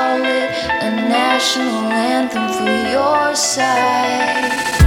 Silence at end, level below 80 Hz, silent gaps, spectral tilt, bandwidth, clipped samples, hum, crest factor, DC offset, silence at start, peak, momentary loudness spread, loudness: 0 s; -48 dBFS; none; -4 dB/octave; 16.5 kHz; under 0.1%; none; 16 dB; under 0.1%; 0 s; 0 dBFS; 4 LU; -16 LUFS